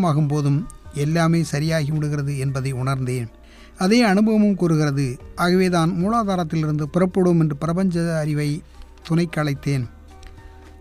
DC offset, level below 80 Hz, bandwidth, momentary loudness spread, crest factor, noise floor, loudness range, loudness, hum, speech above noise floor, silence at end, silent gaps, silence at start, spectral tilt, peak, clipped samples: under 0.1%; -44 dBFS; 14.5 kHz; 9 LU; 16 dB; -42 dBFS; 4 LU; -21 LUFS; none; 22 dB; 0.1 s; none; 0 s; -7 dB/octave; -6 dBFS; under 0.1%